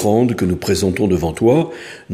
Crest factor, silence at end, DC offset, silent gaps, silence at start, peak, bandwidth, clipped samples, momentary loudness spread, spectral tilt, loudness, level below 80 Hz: 14 dB; 0 s; under 0.1%; none; 0 s; -2 dBFS; 15.5 kHz; under 0.1%; 6 LU; -6.5 dB/octave; -17 LUFS; -40 dBFS